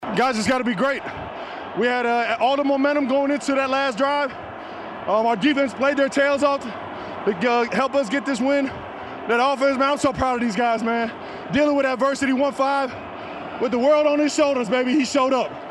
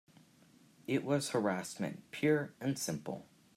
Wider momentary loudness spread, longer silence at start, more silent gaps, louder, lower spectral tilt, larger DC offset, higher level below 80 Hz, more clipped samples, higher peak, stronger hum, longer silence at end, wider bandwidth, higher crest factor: about the same, 13 LU vs 11 LU; second, 0 s vs 0.9 s; neither; first, -21 LUFS vs -36 LUFS; about the same, -4.5 dB/octave vs -5 dB/octave; neither; first, -54 dBFS vs -78 dBFS; neither; first, -6 dBFS vs -18 dBFS; neither; second, 0 s vs 0.3 s; second, 12 kHz vs 16 kHz; about the same, 16 dB vs 18 dB